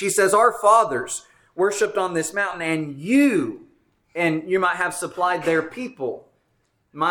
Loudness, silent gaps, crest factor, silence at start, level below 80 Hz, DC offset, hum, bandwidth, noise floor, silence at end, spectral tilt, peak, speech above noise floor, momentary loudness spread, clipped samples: -21 LUFS; none; 18 dB; 0 s; -64 dBFS; under 0.1%; none; 19 kHz; -68 dBFS; 0 s; -4 dB/octave; -4 dBFS; 47 dB; 14 LU; under 0.1%